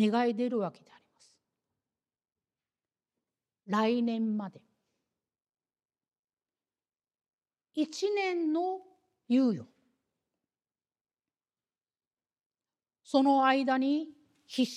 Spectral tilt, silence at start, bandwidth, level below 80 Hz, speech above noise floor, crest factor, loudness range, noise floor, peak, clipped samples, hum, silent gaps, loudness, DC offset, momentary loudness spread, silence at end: -5.5 dB/octave; 0 s; 11 kHz; under -90 dBFS; over 61 dB; 22 dB; 10 LU; under -90 dBFS; -12 dBFS; under 0.1%; none; 6.19-6.23 s, 11.01-11.05 s, 12.46-12.50 s; -30 LUFS; under 0.1%; 13 LU; 0 s